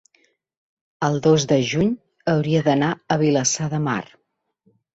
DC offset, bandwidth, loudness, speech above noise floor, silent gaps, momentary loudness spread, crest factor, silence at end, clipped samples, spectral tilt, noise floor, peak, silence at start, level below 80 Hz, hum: under 0.1%; 8.2 kHz; -20 LUFS; 53 dB; none; 7 LU; 18 dB; 0.9 s; under 0.1%; -5 dB/octave; -72 dBFS; -4 dBFS; 1 s; -56 dBFS; none